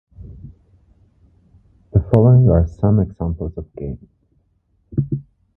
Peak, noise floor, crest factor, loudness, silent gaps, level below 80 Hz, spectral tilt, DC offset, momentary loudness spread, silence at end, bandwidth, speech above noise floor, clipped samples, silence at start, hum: 0 dBFS; -63 dBFS; 18 dB; -17 LUFS; none; -32 dBFS; -12.5 dB/octave; under 0.1%; 19 LU; 0.35 s; 2.8 kHz; 47 dB; under 0.1%; 0.2 s; none